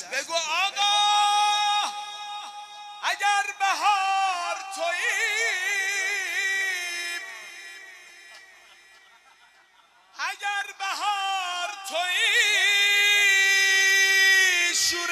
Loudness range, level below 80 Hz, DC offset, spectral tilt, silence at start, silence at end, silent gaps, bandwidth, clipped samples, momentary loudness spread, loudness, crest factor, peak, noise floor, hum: 16 LU; -76 dBFS; under 0.1%; 3 dB/octave; 0 s; 0 s; none; 14 kHz; under 0.1%; 17 LU; -22 LUFS; 16 dB; -8 dBFS; -58 dBFS; none